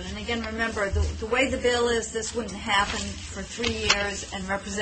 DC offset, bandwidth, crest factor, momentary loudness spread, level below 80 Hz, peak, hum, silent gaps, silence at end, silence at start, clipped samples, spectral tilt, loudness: under 0.1%; 8.8 kHz; 22 dB; 9 LU; -38 dBFS; -4 dBFS; none; none; 0 s; 0 s; under 0.1%; -3.5 dB/octave; -26 LUFS